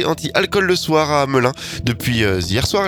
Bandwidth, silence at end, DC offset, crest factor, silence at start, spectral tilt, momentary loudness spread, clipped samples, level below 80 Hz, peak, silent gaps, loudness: over 20 kHz; 0 s; under 0.1%; 18 dB; 0 s; -4.5 dB/octave; 5 LU; under 0.1%; -38 dBFS; 0 dBFS; none; -17 LUFS